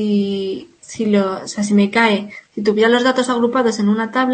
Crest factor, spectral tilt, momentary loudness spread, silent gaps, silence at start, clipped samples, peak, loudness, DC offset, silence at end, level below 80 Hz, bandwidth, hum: 14 dB; -5 dB/octave; 10 LU; none; 0 s; under 0.1%; -2 dBFS; -17 LUFS; under 0.1%; 0 s; -62 dBFS; 8.8 kHz; none